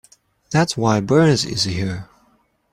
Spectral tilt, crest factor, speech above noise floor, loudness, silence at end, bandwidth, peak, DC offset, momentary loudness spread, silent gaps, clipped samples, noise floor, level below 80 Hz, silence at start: -5 dB/octave; 18 dB; 43 dB; -18 LUFS; 0.7 s; 15 kHz; -2 dBFS; under 0.1%; 11 LU; none; under 0.1%; -60 dBFS; -50 dBFS; 0.5 s